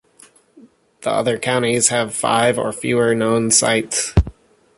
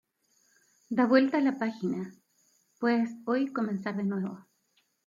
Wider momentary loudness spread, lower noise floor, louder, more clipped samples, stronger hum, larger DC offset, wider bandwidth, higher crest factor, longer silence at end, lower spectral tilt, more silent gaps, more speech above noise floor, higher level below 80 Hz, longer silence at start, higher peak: second, 7 LU vs 13 LU; second, -50 dBFS vs -73 dBFS; first, -17 LUFS vs -29 LUFS; neither; neither; neither; first, 12 kHz vs 7.4 kHz; about the same, 18 dB vs 20 dB; second, 0.45 s vs 0.65 s; second, -3.5 dB/octave vs -7.5 dB/octave; neither; second, 33 dB vs 45 dB; first, -32 dBFS vs -80 dBFS; about the same, 1 s vs 0.9 s; first, 0 dBFS vs -10 dBFS